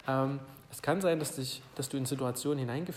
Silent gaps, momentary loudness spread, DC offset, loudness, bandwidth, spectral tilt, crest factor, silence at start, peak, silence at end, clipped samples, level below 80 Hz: none; 8 LU; under 0.1%; -34 LUFS; 16 kHz; -5 dB/octave; 16 dB; 0.05 s; -18 dBFS; 0 s; under 0.1%; -68 dBFS